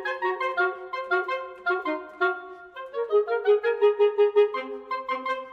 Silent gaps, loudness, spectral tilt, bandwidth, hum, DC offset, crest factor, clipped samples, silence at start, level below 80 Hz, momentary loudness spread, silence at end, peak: none; -25 LUFS; -3.5 dB/octave; 5.6 kHz; none; under 0.1%; 16 dB; under 0.1%; 0 s; -74 dBFS; 12 LU; 0 s; -10 dBFS